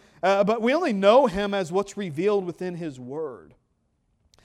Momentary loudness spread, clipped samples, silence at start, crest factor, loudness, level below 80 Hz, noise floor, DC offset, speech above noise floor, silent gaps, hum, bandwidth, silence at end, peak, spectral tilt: 16 LU; under 0.1%; 0.25 s; 20 dB; -23 LUFS; -56 dBFS; -70 dBFS; under 0.1%; 47 dB; none; none; 12 kHz; 1.05 s; -6 dBFS; -6 dB/octave